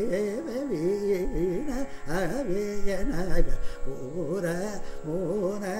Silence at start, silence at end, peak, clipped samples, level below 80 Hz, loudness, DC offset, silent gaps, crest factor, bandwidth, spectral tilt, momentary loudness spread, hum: 0 s; 0 s; -8 dBFS; under 0.1%; -34 dBFS; -30 LUFS; under 0.1%; none; 18 dB; 13.5 kHz; -6.5 dB/octave; 8 LU; none